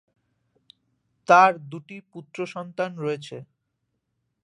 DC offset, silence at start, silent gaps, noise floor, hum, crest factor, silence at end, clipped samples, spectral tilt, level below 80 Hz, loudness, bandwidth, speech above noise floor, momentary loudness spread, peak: under 0.1%; 1.3 s; none; -77 dBFS; none; 24 dB; 1.05 s; under 0.1%; -5 dB/octave; -78 dBFS; -22 LUFS; 11 kHz; 54 dB; 25 LU; -2 dBFS